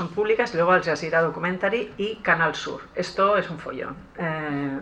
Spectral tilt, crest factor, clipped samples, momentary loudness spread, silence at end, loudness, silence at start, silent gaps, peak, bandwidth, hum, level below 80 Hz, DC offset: -5.5 dB/octave; 18 dB; under 0.1%; 12 LU; 0 s; -24 LUFS; 0 s; none; -6 dBFS; 9.4 kHz; none; -56 dBFS; under 0.1%